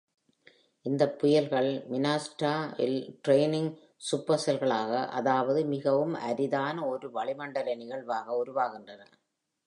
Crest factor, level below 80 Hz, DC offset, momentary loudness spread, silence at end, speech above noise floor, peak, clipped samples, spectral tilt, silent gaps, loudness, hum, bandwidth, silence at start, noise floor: 18 dB; -82 dBFS; under 0.1%; 9 LU; 0.65 s; 51 dB; -10 dBFS; under 0.1%; -5.5 dB/octave; none; -29 LUFS; none; 11 kHz; 0.85 s; -80 dBFS